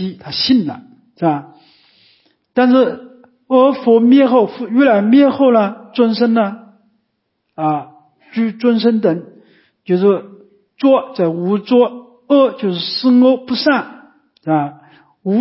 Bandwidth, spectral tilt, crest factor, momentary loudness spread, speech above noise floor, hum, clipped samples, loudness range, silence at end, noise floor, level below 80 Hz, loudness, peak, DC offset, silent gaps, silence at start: 5.8 kHz; -10 dB/octave; 14 dB; 12 LU; 57 dB; none; under 0.1%; 6 LU; 0 s; -69 dBFS; -64 dBFS; -14 LUFS; 0 dBFS; under 0.1%; none; 0 s